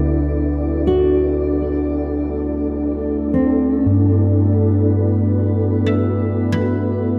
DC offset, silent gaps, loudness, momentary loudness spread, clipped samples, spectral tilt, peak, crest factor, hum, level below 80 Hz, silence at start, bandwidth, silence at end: under 0.1%; none; -18 LUFS; 6 LU; under 0.1%; -10.5 dB/octave; -4 dBFS; 12 dB; none; -28 dBFS; 0 s; 4.1 kHz; 0 s